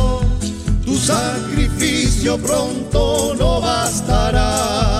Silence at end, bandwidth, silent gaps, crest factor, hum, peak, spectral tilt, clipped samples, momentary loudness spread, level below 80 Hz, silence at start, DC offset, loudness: 0 s; 15.5 kHz; none; 14 dB; none; -2 dBFS; -4.5 dB/octave; under 0.1%; 4 LU; -22 dBFS; 0 s; under 0.1%; -17 LUFS